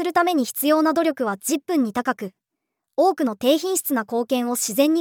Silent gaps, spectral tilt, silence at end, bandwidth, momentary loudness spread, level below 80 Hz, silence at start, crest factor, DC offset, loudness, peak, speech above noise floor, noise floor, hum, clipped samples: none; -3 dB/octave; 0 s; over 20 kHz; 6 LU; -74 dBFS; 0 s; 16 dB; under 0.1%; -21 LUFS; -6 dBFS; 60 dB; -81 dBFS; none; under 0.1%